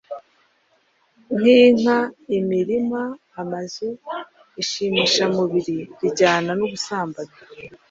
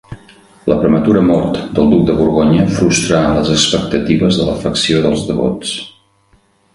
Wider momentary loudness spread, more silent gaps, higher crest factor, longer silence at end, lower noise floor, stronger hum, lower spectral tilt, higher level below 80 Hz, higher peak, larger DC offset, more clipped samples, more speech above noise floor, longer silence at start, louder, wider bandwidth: first, 21 LU vs 6 LU; neither; about the same, 18 dB vs 14 dB; second, 0.15 s vs 0.85 s; first, -63 dBFS vs -53 dBFS; neither; about the same, -4.5 dB/octave vs -5 dB/octave; second, -62 dBFS vs -34 dBFS; about the same, -2 dBFS vs 0 dBFS; neither; neither; about the same, 43 dB vs 41 dB; about the same, 0.1 s vs 0.1 s; second, -20 LUFS vs -13 LUFS; second, 7.8 kHz vs 11.5 kHz